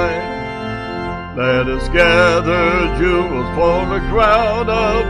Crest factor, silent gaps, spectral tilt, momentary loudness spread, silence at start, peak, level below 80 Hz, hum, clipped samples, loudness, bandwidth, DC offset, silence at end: 14 dB; none; -6 dB/octave; 12 LU; 0 s; 0 dBFS; -26 dBFS; none; under 0.1%; -15 LUFS; 11 kHz; 0.1%; 0 s